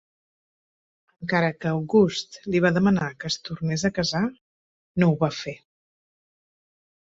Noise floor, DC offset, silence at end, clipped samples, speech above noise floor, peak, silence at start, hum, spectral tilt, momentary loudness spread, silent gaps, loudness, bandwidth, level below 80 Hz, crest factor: under -90 dBFS; under 0.1%; 1.55 s; under 0.1%; over 67 dB; -6 dBFS; 1.2 s; none; -6 dB/octave; 12 LU; 4.41-4.95 s; -24 LUFS; 8 kHz; -58 dBFS; 20 dB